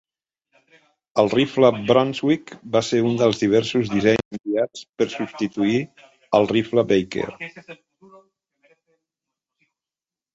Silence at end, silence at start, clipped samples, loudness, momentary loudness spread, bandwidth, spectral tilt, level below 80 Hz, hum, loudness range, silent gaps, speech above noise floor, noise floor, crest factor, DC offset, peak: 2.6 s; 1.15 s; under 0.1%; -21 LUFS; 9 LU; 8 kHz; -6 dB/octave; -58 dBFS; none; 7 LU; 4.25-4.31 s, 4.89-4.93 s; over 70 dB; under -90 dBFS; 20 dB; under 0.1%; -2 dBFS